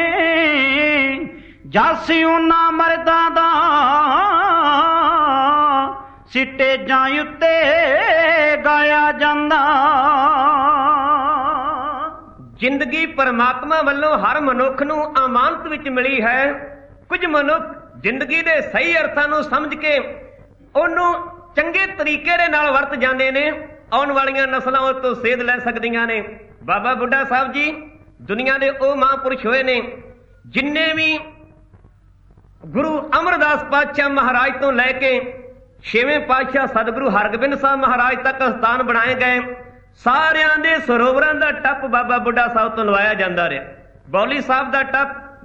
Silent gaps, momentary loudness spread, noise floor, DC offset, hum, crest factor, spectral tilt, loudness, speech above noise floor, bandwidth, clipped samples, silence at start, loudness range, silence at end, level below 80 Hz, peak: none; 8 LU; -49 dBFS; under 0.1%; none; 16 dB; -5 dB/octave; -16 LUFS; 32 dB; 7.6 kHz; under 0.1%; 0 s; 5 LU; 0.1 s; -48 dBFS; -2 dBFS